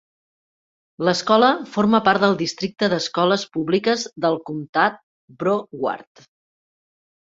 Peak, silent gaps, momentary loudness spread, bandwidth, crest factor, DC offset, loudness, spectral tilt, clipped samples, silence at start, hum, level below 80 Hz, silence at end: -2 dBFS; 4.69-4.73 s, 5.03-5.28 s; 10 LU; 7.8 kHz; 20 dB; under 0.1%; -20 LUFS; -5 dB/octave; under 0.1%; 1 s; none; -62 dBFS; 1.2 s